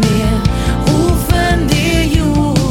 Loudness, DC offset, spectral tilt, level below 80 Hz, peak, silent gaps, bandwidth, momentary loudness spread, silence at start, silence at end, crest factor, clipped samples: -13 LUFS; under 0.1%; -5.5 dB/octave; -18 dBFS; 0 dBFS; none; 17.5 kHz; 2 LU; 0 s; 0 s; 12 dB; under 0.1%